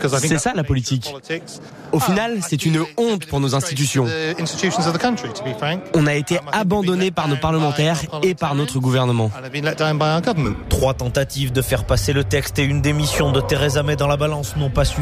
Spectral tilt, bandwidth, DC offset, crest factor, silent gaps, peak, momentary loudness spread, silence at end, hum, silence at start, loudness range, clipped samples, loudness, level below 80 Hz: -5 dB/octave; 15.5 kHz; under 0.1%; 14 dB; none; -4 dBFS; 5 LU; 0 s; none; 0 s; 2 LU; under 0.1%; -19 LUFS; -34 dBFS